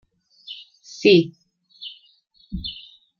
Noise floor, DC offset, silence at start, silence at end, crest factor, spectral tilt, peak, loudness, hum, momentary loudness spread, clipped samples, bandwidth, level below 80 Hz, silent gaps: -58 dBFS; under 0.1%; 0.5 s; 0.45 s; 22 dB; -6 dB/octave; -2 dBFS; -20 LUFS; none; 23 LU; under 0.1%; 7.2 kHz; -48 dBFS; none